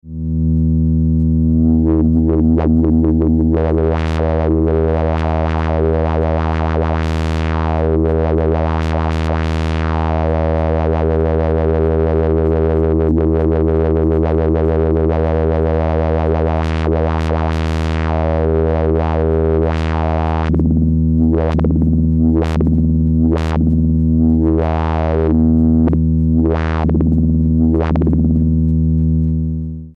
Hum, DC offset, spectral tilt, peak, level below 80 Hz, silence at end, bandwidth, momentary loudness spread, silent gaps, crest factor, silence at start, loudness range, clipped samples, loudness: none; under 0.1%; -9.5 dB/octave; -4 dBFS; -20 dBFS; 0.05 s; 6.2 kHz; 4 LU; none; 10 dB; 0.05 s; 3 LU; under 0.1%; -15 LUFS